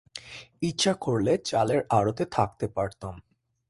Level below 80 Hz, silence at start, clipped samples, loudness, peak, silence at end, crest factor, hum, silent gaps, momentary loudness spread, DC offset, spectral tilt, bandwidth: -54 dBFS; 0.15 s; under 0.1%; -27 LUFS; -8 dBFS; 0.5 s; 20 dB; none; none; 16 LU; under 0.1%; -5 dB/octave; 11.5 kHz